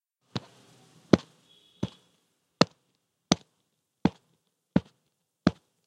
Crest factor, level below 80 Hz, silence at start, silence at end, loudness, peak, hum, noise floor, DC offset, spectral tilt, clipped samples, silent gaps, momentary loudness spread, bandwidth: 32 dB; -56 dBFS; 0.35 s; 0.35 s; -30 LUFS; 0 dBFS; none; -77 dBFS; under 0.1%; -5.5 dB/octave; under 0.1%; none; 14 LU; 10.5 kHz